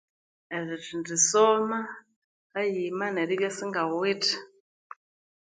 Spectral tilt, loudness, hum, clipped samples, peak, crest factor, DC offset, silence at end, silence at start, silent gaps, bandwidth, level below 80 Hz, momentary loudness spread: -2.5 dB/octave; -27 LUFS; none; under 0.1%; -8 dBFS; 22 dB; under 0.1%; 0.95 s; 0.5 s; 2.16-2.50 s; 9.6 kHz; -78 dBFS; 14 LU